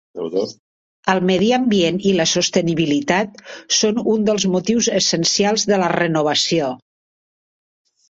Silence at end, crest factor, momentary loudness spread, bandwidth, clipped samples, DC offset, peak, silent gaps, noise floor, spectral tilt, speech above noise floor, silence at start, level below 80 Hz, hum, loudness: 1.3 s; 18 dB; 8 LU; 8 kHz; under 0.1%; under 0.1%; -2 dBFS; 0.59-1.03 s; under -90 dBFS; -3.5 dB/octave; over 73 dB; 0.15 s; -56 dBFS; none; -17 LUFS